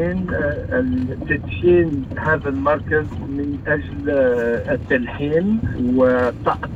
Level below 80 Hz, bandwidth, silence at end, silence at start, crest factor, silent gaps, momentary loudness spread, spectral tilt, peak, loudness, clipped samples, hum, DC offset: -38 dBFS; 7.6 kHz; 0 s; 0 s; 14 dB; none; 7 LU; -9 dB/octave; -4 dBFS; -20 LUFS; under 0.1%; none; under 0.1%